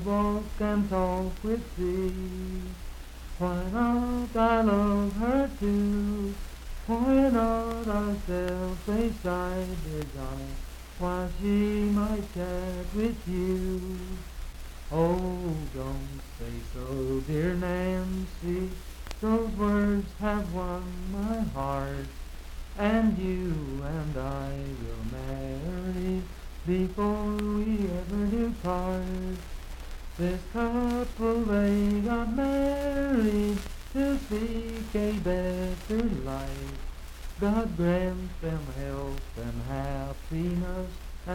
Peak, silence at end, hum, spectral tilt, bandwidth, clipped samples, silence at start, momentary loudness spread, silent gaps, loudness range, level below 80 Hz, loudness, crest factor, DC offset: -10 dBFS; 0 s; none; -7 dB/octave; 17 kHz; under 0.1%; 0 s; 14 LU; none; 5 LU; -38 dBFS; -30 LUFS; 18 dB; under 0.1%